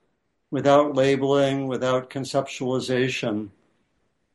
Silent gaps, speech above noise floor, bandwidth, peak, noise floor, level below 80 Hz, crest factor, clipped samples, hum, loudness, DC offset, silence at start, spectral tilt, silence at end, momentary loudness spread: none; 50 dB; 11.5 kHz; -6 dBFS; -73 dBFS; -62 dBFS; 18 dB; under 0.1%; none; -23 LUFS; under 0.1%; 0.5 s; -5.5 dB/octave; 0.85 s; 10 LU